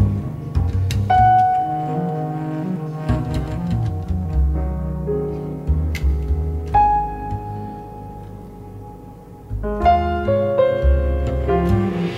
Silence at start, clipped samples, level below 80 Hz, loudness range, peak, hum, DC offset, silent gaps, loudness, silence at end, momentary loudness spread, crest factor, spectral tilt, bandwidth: 0 s; under 0.1%; -26 dBFS; 4 LU; -4 dBFS; none; under 0.1%; none; -20 LUFS; 0 s; 19 LU; 16 dB; -8.5 dB/octave; 12 kHz